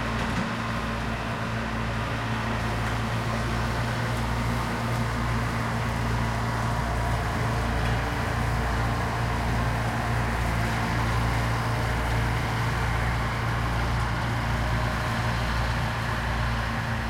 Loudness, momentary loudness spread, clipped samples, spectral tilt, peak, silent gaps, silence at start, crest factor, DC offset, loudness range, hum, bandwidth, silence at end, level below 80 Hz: -27 LUFS; 2 LU; under 0.1%; -5.5 dB/octave; -14 dBFS; none; 0 s; 14 dB; under 0.1%; 2 LU; none; 16 kHz; 0 s; -34 dBFS